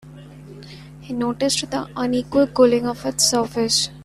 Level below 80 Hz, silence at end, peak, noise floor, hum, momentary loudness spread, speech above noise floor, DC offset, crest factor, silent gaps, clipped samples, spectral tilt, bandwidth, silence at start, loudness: -50 dBFS; 0 s; -2 dBFS; -40 dBFS; none; 23 LU; 20 dB; under 0.1%; 18 dB; none; under 0.1%; -3 dB/octave; 14.5 kHz; 0.05 s; -19 LUFS